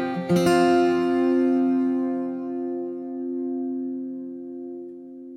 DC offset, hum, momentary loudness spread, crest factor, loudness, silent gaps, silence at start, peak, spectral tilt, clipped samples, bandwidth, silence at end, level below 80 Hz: under 0.1%; none; 17 LU; 14 dB; -23 LUFS; none; 0 s; -10 dBFS; -6.5 dB/octave; under 0.1%; 14 kHz; 0 s; -64 dBFS